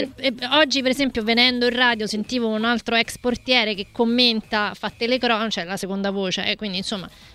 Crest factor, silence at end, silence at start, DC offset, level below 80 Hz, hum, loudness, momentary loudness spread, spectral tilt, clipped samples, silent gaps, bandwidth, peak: 20 dB; 0.05 s; 0 s; under 0.1%; -52 dBFS; none; -20 LUFS; 9 LU; -3.5 dB/octave; under 0.1%; none; 15 kHz; -2 dBFS